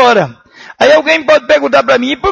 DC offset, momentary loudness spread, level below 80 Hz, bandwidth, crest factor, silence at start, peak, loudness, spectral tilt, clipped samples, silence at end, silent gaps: under 0.1%; 4 LU; -46 dBFS; 8.6 kHz; 10 dB; 0 s; 0 dBFS; -9 LUFS; -4 dB/octave; 0.2%; 0 s; none